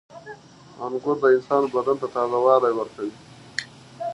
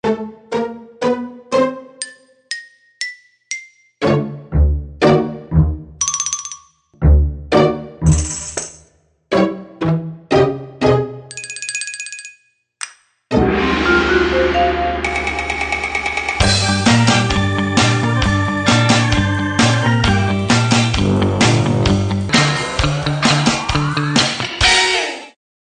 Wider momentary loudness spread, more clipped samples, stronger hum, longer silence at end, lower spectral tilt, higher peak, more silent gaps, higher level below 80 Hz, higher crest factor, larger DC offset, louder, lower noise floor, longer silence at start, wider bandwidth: first, 20 LU vs 14 LU; neither; neither; second, 0 s vs 0.45 s; about the same, -5.5 dB/octave vs -4.5 dB/octave; second, -4 dBFS vs 0 dBFS; neither; second, -68 dBFS vs -26 dBFS; about the same, 20 dB vs 16 dB; neither; second, -22 LUFS vs -16 LUFS; second, -43 dBFS vs -54 dBFS; about the same, 0.15 s vs 0.05 s; first, 11 kHz vs 9.8 kHz